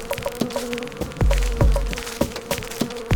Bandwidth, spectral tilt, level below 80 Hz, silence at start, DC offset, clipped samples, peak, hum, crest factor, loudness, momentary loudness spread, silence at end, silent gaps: over 20 kHz; -5 dB/octave; -26 dBFS; 0 s; under 0.1%; under 0.1%; -4 dBFS; none; 18 dB; -25 LUFS; 7 LU; 0 s; none